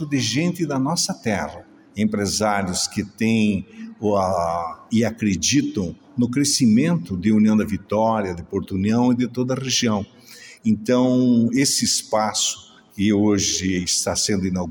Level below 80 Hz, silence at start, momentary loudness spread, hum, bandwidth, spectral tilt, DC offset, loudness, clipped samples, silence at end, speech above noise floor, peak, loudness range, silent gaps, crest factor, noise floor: -52 dBFS; 0 s; 9 LU; none; 17 kHz; -4 dB/octave; under 0.1%; -20 LUFS; under 0.1%; 0 s; 24 dB; -6 dBFS; 3 LU; none; 14 dB; -44 dBFS